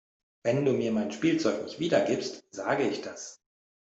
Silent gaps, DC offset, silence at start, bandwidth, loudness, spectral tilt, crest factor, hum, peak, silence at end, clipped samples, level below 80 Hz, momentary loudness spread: none; under 0.1%; 0.45 s; 8.2 kHz; -29 LUFS; -5.5 dB/octave; 18 dB; none; -12 dBFS; 0.65 s; under 0.1%; -68 dBFS; 11 LU